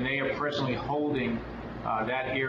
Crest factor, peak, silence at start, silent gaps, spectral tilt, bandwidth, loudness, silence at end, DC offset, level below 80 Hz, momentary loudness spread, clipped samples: 14 dB; -16 dBFS; 0 s; none; -7 dB/octave; 7.4 kHz; -30 LUFS; 0 s; under 0.1%; -50 dBFS; 7 LU; under 0.1%